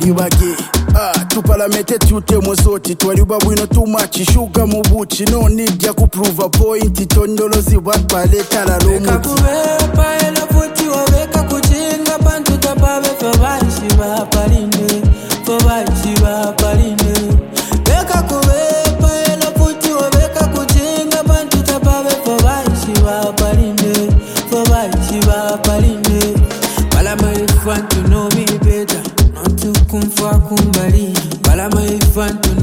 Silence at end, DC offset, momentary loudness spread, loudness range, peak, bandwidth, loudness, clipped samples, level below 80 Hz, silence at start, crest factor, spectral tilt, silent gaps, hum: 0 s; under 0.1%; 3 LU; 1 LU; 0 dBFS; 17 kHz; -13 LUFS; under 0.1%; -16 dBFS; 0 s; 12 dB; -5 dB/octave; none; none